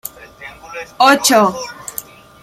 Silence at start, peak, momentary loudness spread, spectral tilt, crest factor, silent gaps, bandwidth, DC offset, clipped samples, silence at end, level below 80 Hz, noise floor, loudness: 0.05 s; 0 dBFS; 24 LU; -2.5 dB/octave; 16 dB; none; 16.5 kHz; under 0.1%; under 0.1%; 0.4 s; -54 dBFS; -36 dBFS; -12 LUFS